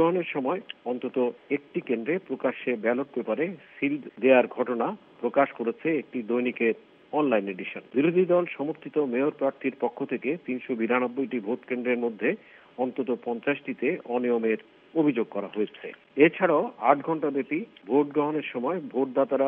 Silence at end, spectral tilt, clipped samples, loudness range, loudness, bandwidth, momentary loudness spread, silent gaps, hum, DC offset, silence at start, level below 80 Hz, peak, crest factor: 0 s; -9.5 dB/octave; under 0.1%; 4 LU; -27 LUFS; 3.9 kHz; 9 LU; none; none; under 0.1%; 0 s; -82 dBFS; -4 dBFS; 22 dB